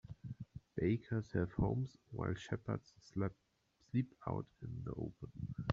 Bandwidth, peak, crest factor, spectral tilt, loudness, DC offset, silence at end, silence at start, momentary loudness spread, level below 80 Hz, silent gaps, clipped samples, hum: 7.6 kHz; -18 dBFS; 22 dB; -8 dB/octave; -42 LUFS; under 0.1%; 0 s; 0.1 s; 11 LU; -58 dBFS; none; under 0.1%; none